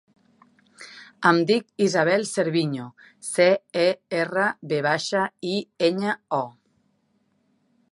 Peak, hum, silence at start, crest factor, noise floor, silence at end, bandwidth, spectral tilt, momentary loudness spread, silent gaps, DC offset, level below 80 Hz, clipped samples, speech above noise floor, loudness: -4 dBFS; none; 0.8 s; 20 dB; -68 dBFS; 1.4 s; 11.5 kHz; -4.5 dB/octave; 15 LU; none; under 0.1%; -74 dBFS; under 0.1%; 45 dB; -23 LUFS